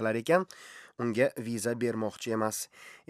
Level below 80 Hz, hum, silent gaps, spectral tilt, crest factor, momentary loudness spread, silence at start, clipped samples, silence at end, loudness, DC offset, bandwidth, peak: -80 dBFS; none; none; -5 dB/octave; 22 dB; 14 LU; 0 s; under 0.1%; 0.15 s; -31 LUFS; under 0.1%; 15.5 kHz; -10 dBFS